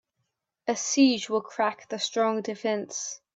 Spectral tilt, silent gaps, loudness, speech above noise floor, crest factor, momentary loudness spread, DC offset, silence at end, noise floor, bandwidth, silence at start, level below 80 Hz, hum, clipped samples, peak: -2.5 dB/octave; none; -27 LUFS; 53 dB; 18 dB; 11 LU; under 0.1%; 0.2 s; -80 dBFS; 8 kHz; 0.65 s; -78 dBFS; none; under 0.1%; -8 dBFS